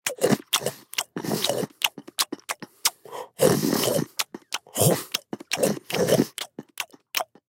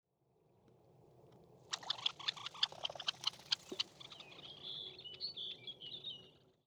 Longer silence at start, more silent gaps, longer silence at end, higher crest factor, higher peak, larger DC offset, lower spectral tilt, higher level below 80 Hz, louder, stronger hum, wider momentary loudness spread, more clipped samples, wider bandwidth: second, 0.05 s vs 0.65 s; neither; first, 0.3 s vs 0.15 s; about the same, 24 dB vs 28 dB; first, -2 dBFS vs -18 dBFS; neither; first, -3.5 dB/octave vs -0.5 dB/octave; first, -64 dBFS vs -82 dBFS; first, -25 LUFS vs -42 LUFS; neither; about the same, 12 LU vs 12 LU; neither; second, 17 kHz vs over 20 kHz